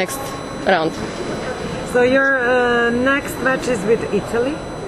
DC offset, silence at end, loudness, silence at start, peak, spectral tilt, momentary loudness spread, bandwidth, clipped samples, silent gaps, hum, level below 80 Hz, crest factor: under 0.1%; 0 s; -18 LUFS; 0 s; -2 dBFS; -4.5 dB/octave; 10 LU; 13 kHz; under 0.1%; none; none; -42 dBFS; 16 dB